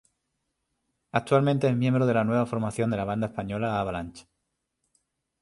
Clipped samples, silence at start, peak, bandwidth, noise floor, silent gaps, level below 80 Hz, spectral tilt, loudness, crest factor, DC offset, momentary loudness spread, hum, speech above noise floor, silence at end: under 0.1%; 1.15 s; -8 dBFS; 11.5 kHz; -80 dBFS; none; -56 dBFS; -7.5 dB/octave; -26 LUFS; 18 dB; under 0.1%; 8 LU; none; 55 dB; 1.2 s